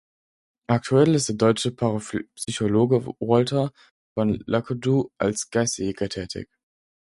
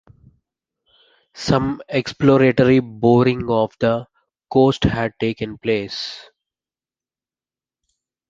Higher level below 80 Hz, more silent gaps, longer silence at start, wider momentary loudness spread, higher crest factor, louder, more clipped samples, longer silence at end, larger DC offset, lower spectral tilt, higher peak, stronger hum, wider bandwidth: second, -54 dBFS vs -44 dBFS; first, 3.91-4.16 s vs none; second, 0.7 s vs 1.35 s; about the same, 11 LU vs 12 LU; about the same, 20 dB vs 18 dB; second, -23 LUFS vs -18 LUFS; neither; second, 0.7 s vs 2.1 s; neither; second, -5.5 dB/octave vs -7 dB/octave; about the same, -4 dBFS vs -2 dBFS; neither; first, 11.5 kHz vs 7.6 kHz